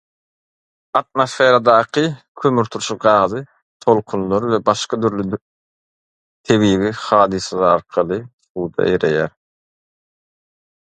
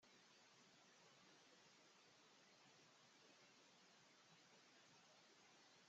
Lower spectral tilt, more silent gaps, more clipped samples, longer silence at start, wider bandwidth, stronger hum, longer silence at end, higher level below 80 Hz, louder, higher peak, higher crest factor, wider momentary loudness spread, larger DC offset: first, -5.5 dB/octave vs -1 dB/octave; first, 2.28-2.35 s, 3.62-3.80 s, 5.41-6.44 s, 8.33-8.39 s, 8.50-8.55 s vs none; neither; first, 0.95 s vs 0 s; first, 11 kHz vs 7.6 kHz; neither; first, 1.55 s vs 0 s; first, -52 dBFS vs under -90 dBFS; first, -17 LUFS vs -70 LUFS; first, 0 dBFS vs -58 dBFS; about the same, 18 dB vs 14 dB; first, 11 LU vs 0 LU; neither